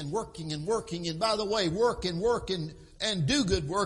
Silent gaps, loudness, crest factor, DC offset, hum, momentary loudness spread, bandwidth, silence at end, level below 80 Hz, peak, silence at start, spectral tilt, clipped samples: none; -29 LUFS; 16 dB; under 0.1%; none; 8 LU; 11.5 kHz; 0 s; -48 dBFS; -14 dBFS; 0 s; -4.5 dB/octave; under 0.1%